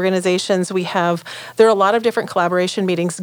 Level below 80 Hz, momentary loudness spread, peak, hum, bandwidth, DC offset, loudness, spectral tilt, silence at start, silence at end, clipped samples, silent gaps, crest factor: -74 dBFS; 6 LU; -2 dBFS; none; over 20 kHz; under 0.1%; -17 LUFS; -5 dB/octave; 0 s; 0 s; under 0.1%; none; 16 dB